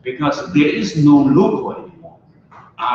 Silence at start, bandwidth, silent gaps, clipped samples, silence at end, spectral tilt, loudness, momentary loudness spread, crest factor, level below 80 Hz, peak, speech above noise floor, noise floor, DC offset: 0.05 s; 7.2 kHz; none; under 0.1%; 0 s; -7 dB/octave; -15 LUFS; 13 LU; 14 dB; -52 dBFS; -2 dBFS; 31 dB; -45 dBFS; under 0.1%